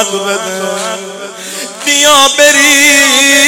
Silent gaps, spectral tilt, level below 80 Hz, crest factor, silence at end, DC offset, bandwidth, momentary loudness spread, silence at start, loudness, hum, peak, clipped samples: none; 0 dB/octave; -50 dBFS; 10 dB; 0 s; under 0.1%; over 20 kHz; 17 LU; 0 s; -6 LUFS; none; 0 dBFS; 0.6%